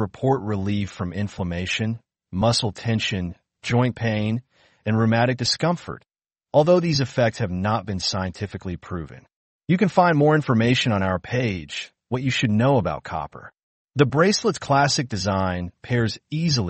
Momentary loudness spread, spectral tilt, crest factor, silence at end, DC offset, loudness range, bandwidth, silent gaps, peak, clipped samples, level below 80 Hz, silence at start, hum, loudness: 14 LU; -5.5 dB/octave; 18 dB; 0 s; under 0.1%; 3 LU; 8.8 kHz; 9.36-9.59 s, 13.63-13.88 s; -4 dBFS; under 0.1%; -50 dBFS; 0 s; none; -22 LUFS